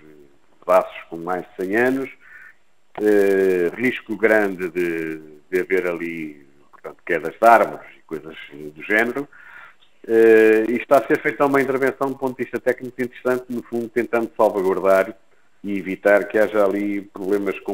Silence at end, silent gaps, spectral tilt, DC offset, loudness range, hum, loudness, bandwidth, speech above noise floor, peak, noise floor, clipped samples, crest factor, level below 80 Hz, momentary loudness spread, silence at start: 0 s; none; -6 dB/octave; 0.3%; 4 LU; none; -20 LUFS; 16 kHz; 33 dB; 0 dBFS; -52 dBFS; under 0.1%; 20 dB; -64 dBFS; 18 LU; 0.65 s